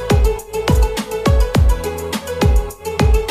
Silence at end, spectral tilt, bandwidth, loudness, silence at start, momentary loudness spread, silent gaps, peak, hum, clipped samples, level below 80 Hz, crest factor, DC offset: 0 s; -6 dB/octave; 15.5 kHz; -17 LUFS; 0 s; 7 LU; none; 0 dBFS; none; under 0.1%; -18 dBFS; 14 dB; under 0.1%